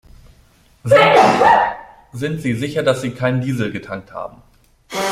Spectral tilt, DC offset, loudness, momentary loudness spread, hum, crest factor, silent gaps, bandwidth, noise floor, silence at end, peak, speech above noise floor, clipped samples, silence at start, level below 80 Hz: -5.5 dB/octave; under 0.1%; -15 LUFS; 20 LU; none; 16 dB; none; 15.5 kHz; -52 dBFS; 0 s; 0 dBFS; 35 dB; under 0.1%; 0.85 s; -50 dBFS